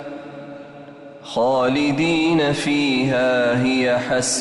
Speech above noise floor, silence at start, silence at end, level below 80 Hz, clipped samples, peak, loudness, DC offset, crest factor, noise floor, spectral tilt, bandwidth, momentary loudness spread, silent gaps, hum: 21 dB; 0 s; 0 s; -54 dBFS; under 0.1%; -8 dBFS; -19 LUFS; under 0.1%; 10 dB; -39 dBFS; -4.5 dB/octave; 11.5 kHz; 20 LU; none; none